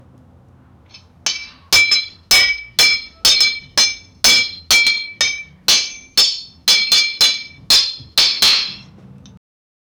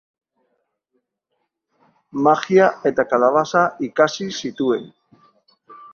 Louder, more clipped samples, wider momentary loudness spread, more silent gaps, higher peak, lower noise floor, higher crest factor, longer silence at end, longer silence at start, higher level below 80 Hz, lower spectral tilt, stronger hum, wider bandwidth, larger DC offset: first, -13 LUFS vs -18 LUFS; neither; second, 8 LU vs 11 LU; neither; about the same, 0 dBFS vs -2 dBFS; second, -47 dBFS vs -74 dBFS; about the same, 18 dB vs 18 dB; first, 1.2 s vs 0.05 s; second, 1.25 s vs 2.15 s; first, -50 dBFS vs -66 dBFS; second, 1.5 dB/octave vs -5 dB/octave; neither; first, over 20 kHz vs 7 kHz; neither